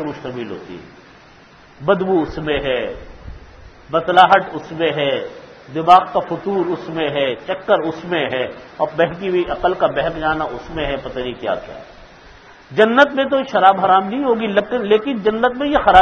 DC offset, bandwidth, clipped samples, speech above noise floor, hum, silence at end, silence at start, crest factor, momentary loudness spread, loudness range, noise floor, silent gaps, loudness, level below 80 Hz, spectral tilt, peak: under 0.1%; 7.8 kHz; under 0.1%; 28 dB; none; 0 s; 0 s; 18 dB; 16 LU; 7 LU; -45 dBFS; none; -17 LUFS; -42 dBFS; -6.5 dB/octave; 0 dBFS